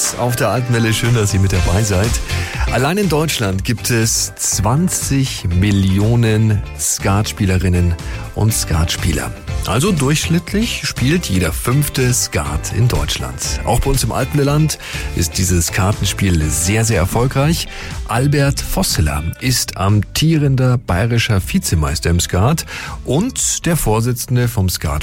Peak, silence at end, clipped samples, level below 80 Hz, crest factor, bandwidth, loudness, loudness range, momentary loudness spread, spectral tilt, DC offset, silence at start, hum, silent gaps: -4 dBFS; 0 s; under 0.1%; -26 dBFS; 12 dB; 16.5 kHz; -16 LUFS; 2 LU; 5 LU; -4.5 dB/octave; under 0.1%; 0 s; none; none